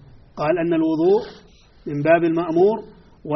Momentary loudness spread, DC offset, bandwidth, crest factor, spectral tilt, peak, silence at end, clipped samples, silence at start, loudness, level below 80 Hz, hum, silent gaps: 16 LU; under 0.1%; 6 kHz; 16 dB; -6.5 dB/octave; -4 dBFS; 0 s; under 0.1%; 0.35 s; -19 LUFS; -54 dBFS; none; none